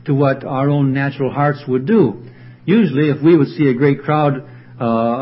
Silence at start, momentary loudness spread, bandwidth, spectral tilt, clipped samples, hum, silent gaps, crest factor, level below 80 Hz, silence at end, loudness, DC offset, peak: 0.05 s; 7 LU; 5.8 kHz; -13 dB/octave; under 0.1%; none; none; 14 dB; -56 dBFS; 0 s; -16 LUFS; under 0.1%; 0 dBFS